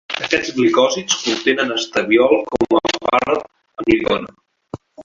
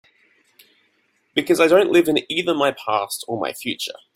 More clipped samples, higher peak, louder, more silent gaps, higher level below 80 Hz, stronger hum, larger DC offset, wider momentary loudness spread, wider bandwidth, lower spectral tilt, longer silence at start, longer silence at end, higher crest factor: neither; about the same, 0 dBFS vs -2 dBFS; about the same, -17 LUFS vs -19 LUFS; neither; first, -50 dBFS vs -64 dBFS; neither; neither; first, 15 LU vs 12 LU; second, 7.6 kHz vs 16 kHz; about the same, -3 dB/octave vs -4 dB/octave; second, 0.1 s vs 1.35 s; second, 0 s vs 0.25 s; about the same, 18 dB vs 18 dB